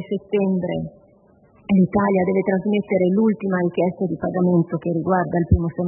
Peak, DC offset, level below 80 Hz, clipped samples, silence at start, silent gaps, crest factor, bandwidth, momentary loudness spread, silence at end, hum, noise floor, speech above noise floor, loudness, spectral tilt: -4 dBFS; under 0.1%; -40 dBFS; under 0.1%; 0 s; none; 16 dB; 3.1 kHz; 6 LU; 0 s; none; -54 dBFS; 34 dB; -20 LUFS; -13 dB/octave